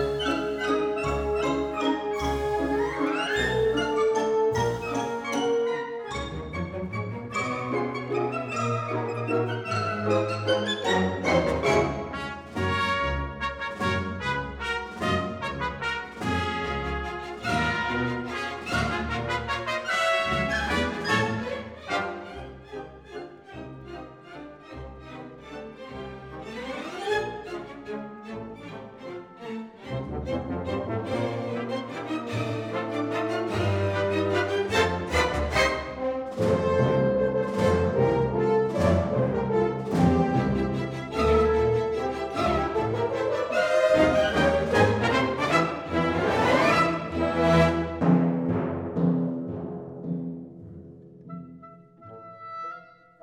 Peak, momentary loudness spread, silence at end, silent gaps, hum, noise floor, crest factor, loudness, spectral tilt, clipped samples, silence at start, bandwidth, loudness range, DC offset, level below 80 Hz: -8 dBFS; 18 LU; 0.35 s; none; none; -48 dBFS; 18 dB; -26 LUFS; -6 dB/octave; under 0.1%; 0 s; 16 kHz; 12 LU; under 0.1%; -44 dBFS